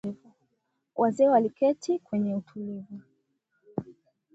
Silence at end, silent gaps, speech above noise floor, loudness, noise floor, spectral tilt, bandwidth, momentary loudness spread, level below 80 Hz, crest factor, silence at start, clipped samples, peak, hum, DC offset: 0.45 s; none; 52 dB; -27 LUFS; -78 dBFS; -7.5 dB/octave; 8 kHz; 19 LU; -72 dBFS; 18 dB; 0.05 s; under 0.1%; -10 dBFS; none; under 0.1%